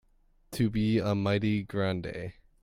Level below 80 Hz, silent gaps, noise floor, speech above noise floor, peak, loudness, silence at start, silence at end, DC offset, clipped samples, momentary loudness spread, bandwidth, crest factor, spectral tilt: -52 dBFS; none; -65 dBFS; 36 dB; -16 dBFS; -29 LUFS; 0.5 s; 0.3 s; under 0.1%; under 0.1%; 13 LU; 16 kHz; 14 dB; -7 dB/octave